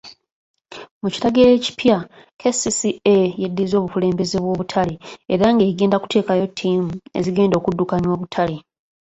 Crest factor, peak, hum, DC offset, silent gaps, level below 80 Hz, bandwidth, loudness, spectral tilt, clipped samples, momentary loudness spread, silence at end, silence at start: 18 dB; 0 dBFS; none; under 0.1%; 0.32-0.54 s, 0.91-1.01 s, 2.33-2.37 s; -50 dBFS; 8.2 kHz; -19 LUFS; -5.5 dB/octave; under 0.1%; 10 LU; 0.5 s; 0.05 s